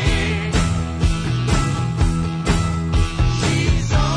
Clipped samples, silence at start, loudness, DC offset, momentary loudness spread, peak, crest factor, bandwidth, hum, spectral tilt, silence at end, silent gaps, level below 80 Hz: under 0.1%; 0 s; -20 LUFS; under 0.1%; 3 LU; -4 dBFS; 14 dB; 10.5 kHz; none; -5.5 dB/octave; 0 s; none; -22 dBFS